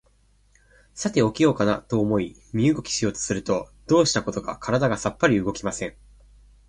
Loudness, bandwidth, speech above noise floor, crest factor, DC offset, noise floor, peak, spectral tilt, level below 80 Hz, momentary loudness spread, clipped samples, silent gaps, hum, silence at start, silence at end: -23 LUFS; 11 kHz; 38 dB; 20 dB; under 0.1%; -60 dBFS; -4 dBFS; -5 dB/octave; -50 dBFS; 10 LU; under 0.1%; none; 50 Hz at -50 dBFS; 0.95 s; 0.8 s